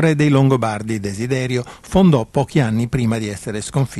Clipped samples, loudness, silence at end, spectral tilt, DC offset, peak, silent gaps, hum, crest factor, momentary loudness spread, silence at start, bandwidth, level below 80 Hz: under 0.1%; -18 LUFS; 0 s; -6.5 dB/octave; under 0.1%; -2 dBFS; none; none; 16 dB; 10 LU; 0 s; 12.5 kHz; -40 dBFS